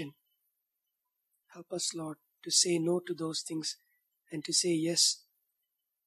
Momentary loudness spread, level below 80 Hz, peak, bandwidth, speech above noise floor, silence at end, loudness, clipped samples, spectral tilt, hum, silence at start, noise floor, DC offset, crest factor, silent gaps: 18 LU; -90 dBFS; -12 dBFS; 14 kHz; 54 dB; 0.9 s; -30 LUFS; under 0.1%; -2.5 dB/octave; none; 0 s; -85 dBFS; under 0.1%; 22 dB; none